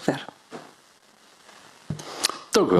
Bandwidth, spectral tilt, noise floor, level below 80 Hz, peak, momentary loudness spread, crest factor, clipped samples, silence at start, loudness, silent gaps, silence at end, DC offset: 14.5 kHz; -4 dB/octave; -56 dBFS; -62 dBFS; -4 dBFS; 26 LU; 24 dB; under 0.1%; 0 s; -27 LUFS; none; 0 s; under 0.1%